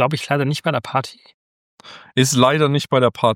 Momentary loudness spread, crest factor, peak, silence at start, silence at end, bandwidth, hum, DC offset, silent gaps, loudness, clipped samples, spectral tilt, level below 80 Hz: 9 LU; 18 dB; 0 dBFS; 0 s; 0 s; 16.5 kHz; none; under 0.1%; 1.34-1.78 s; -18 LUFS; under 0.1%; -5 dB/octave; -60 dBFS